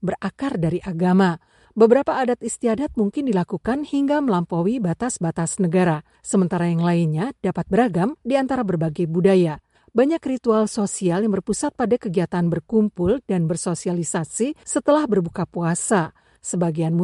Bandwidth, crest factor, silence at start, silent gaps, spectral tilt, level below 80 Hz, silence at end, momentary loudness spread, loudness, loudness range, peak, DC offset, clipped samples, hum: 11.5 kHz; 18 dB; 0 s; none; -6.5 dB/octave; -52 dBFS; 0 s; 7 LU; -21 LUFS; 2 LU; -2 dBFS; under 0.1%; under 0.1%; none